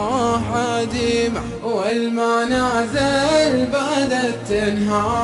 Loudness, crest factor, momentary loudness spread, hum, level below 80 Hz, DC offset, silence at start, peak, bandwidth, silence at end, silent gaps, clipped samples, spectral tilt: -19 LUFS; 14 dB; 5 LU; none; -40 dBFS; under 0.1%; 0 s; -6 dBFS; 11.5 kHz; 0 s; none; under 0.1%; -4.5 dB/octave